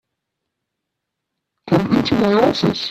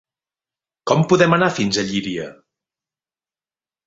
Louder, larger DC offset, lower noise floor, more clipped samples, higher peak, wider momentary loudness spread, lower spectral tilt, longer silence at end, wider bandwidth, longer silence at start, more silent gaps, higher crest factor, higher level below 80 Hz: about the same, -16 LUFS vs -17 LUFS; neither; second, -79 dBFS vs under -90 dBFS; neither; about the same, 0 dBFS vs -2 dBFS; second, 4 LU vs 15 LU; first, -6.5 dB/octave vs -5 dB/octave; second, 0 s vs 1.55 s; first, 13.5 kHz vs 8 kHz; first, 1.65 s vs 0.85 s; neither; about the same, 18 dB vs 20 dB; first, -50 dBFS vs -58 dBFS